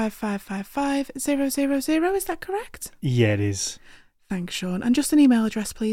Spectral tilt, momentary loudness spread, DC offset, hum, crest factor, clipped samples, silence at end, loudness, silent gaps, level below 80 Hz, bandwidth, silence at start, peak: -5 dB/octave; 12 LU; under 0.1%; none; 16 dB; under 0.1%; 0 s; -24 LUFS; none; -50 dBFS; 16.5 kHz; 0 s; -8 dBFS